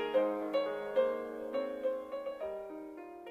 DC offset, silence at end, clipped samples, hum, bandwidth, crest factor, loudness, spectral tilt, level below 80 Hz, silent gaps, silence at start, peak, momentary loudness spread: under 0.1%; 0 s; under 0.1%; none; 5.4 kHz; 18 dB; -36 LUFS; -5.5 dB/octave; -74 dBFS; none; 0 s; -18 dBFS; 13 LU